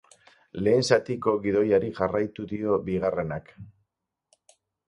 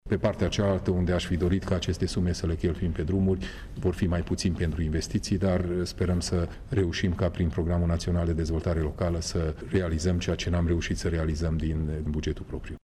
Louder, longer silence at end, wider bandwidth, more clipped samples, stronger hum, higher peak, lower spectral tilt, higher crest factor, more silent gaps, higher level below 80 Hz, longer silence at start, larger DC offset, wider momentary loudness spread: first, -25 LUFS vs -28 LUFS; first, 1.2 s vs 0.05 s; about the same, 11 kHz vs 12 kHz; neither; neither; first, -6 dBFS vs -14 dBFS; about the same, -6 dB/octave vs -6.5 dB/octave; first, 22 dB vs 12 dB; neither; second, -56 dBFS vs -36 dBFS; first, 0.55 s vs 0.05 s; neither; first, 9 LU vs 4 LU